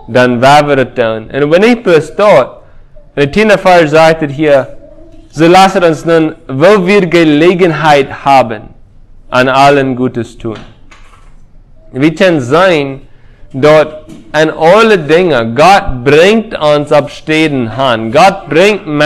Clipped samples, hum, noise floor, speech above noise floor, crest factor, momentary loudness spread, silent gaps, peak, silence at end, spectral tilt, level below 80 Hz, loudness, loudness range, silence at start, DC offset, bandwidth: 3%; none; -35 dBFS; 28 dB; 8 dB; 10 LU; none; 0 dBFS; 0 s; -5.5 dB/octave; -36 dBFS; -8 LUFS; 5 LU; 0.05 s; under 0.1%; 16 kHz